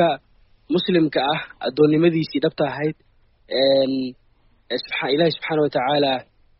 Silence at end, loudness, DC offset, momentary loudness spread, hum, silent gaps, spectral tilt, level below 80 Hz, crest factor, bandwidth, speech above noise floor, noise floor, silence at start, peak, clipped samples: 0.35 s; -21 LUFS; under 0.1%; 10 LU; none; none; -4 dB/octave; -58 dBFS; 16 dB; 5.8 kHz; 38 dB; -58 dBFS; 0 s; -4 dBFS; under 0.1%